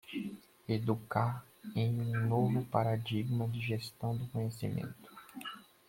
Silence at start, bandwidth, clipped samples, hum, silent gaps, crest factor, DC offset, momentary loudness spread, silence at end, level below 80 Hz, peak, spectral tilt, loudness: 0.05 s; 16.5 kHz; under 0.1%; none; none; 22 dB; under 0.1%; 14 LU; 0.3 s; -68 dBFS; -14 dBFS; -7.5 dB/octave; -36 LUFS